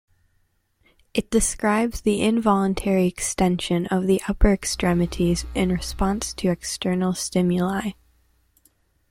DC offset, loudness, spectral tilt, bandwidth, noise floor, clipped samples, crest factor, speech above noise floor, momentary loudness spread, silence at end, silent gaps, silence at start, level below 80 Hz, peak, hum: under 0.1%; -22 LUFS; -5 dB/octave; 16 kHz; -66 dBFS; under 0.1%; 18 dB; 45 dB; 4 LU; 1.2 s; none; 1.15 s; -34 dBFS; -6 dBFS; none